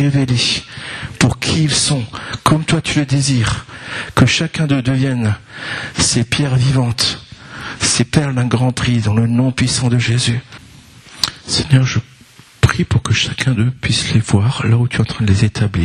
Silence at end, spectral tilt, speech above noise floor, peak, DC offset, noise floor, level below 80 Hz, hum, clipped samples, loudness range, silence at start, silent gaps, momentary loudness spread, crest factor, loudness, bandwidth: 0 s; -4.5 dB/octave; 28 dB; 0 dBFS; under 0.1%; -43 dBFS; -36 dBFS; none; under 0.1%; 2 LU; 0 s; none; 9 LU; 16 dB; -15 LUFS; 13 kHz